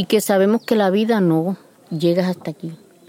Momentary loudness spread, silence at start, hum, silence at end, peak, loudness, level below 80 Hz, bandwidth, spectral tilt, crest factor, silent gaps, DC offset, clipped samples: 15 LU; 0 s; none; 0.35 s; -4 dBFS; -18 LUFS; -70 dBFS; 17 kHz; -6 dB/octave; 16 dB; none; under 0.1%; under 0.1%